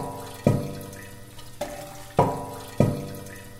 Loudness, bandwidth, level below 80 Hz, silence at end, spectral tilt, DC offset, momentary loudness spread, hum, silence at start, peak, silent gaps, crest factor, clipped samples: -28 LUFS; 16 kHz; -46 dBFS; 0 s; -7 dB/octave; under 0.1%; 17 LU; none; 0 s; -2 dBFS; none; 26 dB; under 0.1%